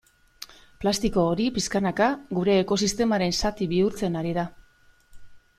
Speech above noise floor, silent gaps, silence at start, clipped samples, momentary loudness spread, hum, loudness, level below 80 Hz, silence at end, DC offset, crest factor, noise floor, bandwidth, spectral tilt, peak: 34 dB; none; 0.4 s; under 0.1%; 11 LU; none; -25 LUFS; -46 dBFS; 0.2 s; under 0.1%; 18 dB; -58 dBFS; 15 kHz; -5 dB/octave; -8 dBFS